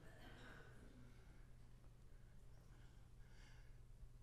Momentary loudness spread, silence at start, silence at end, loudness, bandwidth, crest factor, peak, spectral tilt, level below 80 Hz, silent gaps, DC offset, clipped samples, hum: 6 LU; 0 s; 0 s; -66 LUFS; 12.5 kHz; 14 dB; -48 dBFS; -5.5 dB/octave; -64 dBFS; none; under 0.1%; under 0.1%; none